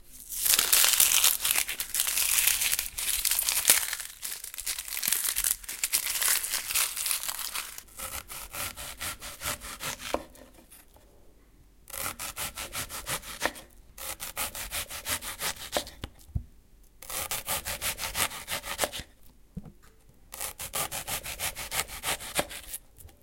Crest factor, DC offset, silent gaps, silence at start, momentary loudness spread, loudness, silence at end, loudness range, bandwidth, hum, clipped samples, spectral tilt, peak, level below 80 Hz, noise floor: 32 dB; under 0.1%; none; 0.05 s; 17 LU; -28 LUFS; 0.1 s; 14 LU; 17 kHz; none; under 0.1%; 0.5 dB/octave; 0 dBFS; -52 dBFS; -57 dBFS